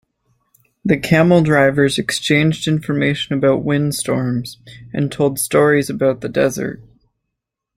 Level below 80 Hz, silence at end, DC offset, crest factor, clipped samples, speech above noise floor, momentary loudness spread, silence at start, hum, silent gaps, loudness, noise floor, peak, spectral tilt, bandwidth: -50 dBFS; 0.95 s; under 0.1%; 16 dB; under 0.1%; 63 dB; 12 LU; 0.85 s; none; none; -16 LUFS; -79 dBFS; -2 dBFS; -5.5 dB/octave; 16 kHz